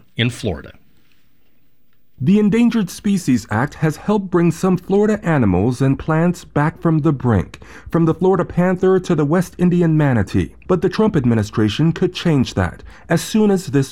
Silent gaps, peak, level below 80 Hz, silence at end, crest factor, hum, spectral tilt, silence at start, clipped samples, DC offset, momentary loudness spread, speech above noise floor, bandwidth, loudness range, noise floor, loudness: none; -4 dBFS; -44 dBFS; 0 s; 14 dB; none; -7 dB/octave; 0.15 s; under 0.1%; 0.4%; 6 LU; 46 dB; 14.5 kHz; 2 LU; -62 dBFS; -17 LUFS